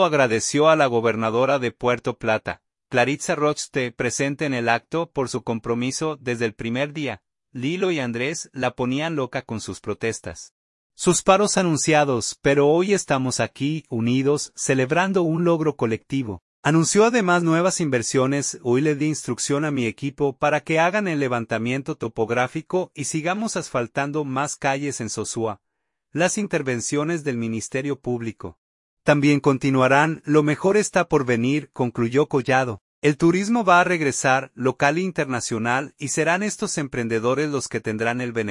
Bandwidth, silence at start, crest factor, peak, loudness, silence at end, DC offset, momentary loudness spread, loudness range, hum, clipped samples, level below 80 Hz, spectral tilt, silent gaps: 11.5 kHz; 0 s; 20 dB; -2 dBFS; -22 LUFS; 0 s; under 0.1%; 9 LU; 6 LU; none; under 0.1%; -58 dBFS; -4.5 dB/octave; 10.51-10.90 s, 16.42-16.63 s, 28.58-28.97 s, 32.81-33.02 s